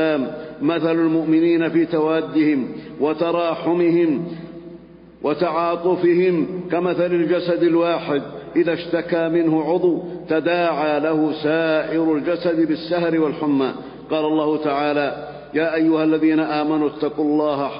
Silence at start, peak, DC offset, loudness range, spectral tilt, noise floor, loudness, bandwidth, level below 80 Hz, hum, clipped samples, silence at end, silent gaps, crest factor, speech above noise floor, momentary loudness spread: 0 s; -6 dBFS; under 0.1%; 2 LU; -11.5 dB/octave; -42 dBFS; -20 LUFS; 5.4 kHz; -58 dBFS; none; under 0.1%; 0 s; none; 12 dB; 23 dB; 8 LU